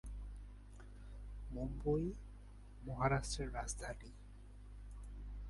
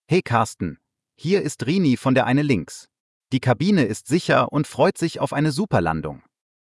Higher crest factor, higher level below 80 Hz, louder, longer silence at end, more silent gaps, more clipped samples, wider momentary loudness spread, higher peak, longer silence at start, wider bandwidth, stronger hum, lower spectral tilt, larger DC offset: first, 24 dB vs 16 dB; about the same, -50 dBFS vs -54 dBFS; second, -43 LUFS vs -21 LUFS; second, 0 s vs 0.45 s; second, none vs 3.00-3.21 s; neither; first, 20 LU vs 11 LU; second, -20 dBFS vs -4 dBFS; about the same, 0.05 s vs 0.1 s; about the same, 11.5 kHz vs 12 kHz; first, 50 Hz at -50 dBFS vs none; about the same, -5.5 dB/octave vs -6 dB/octave; neither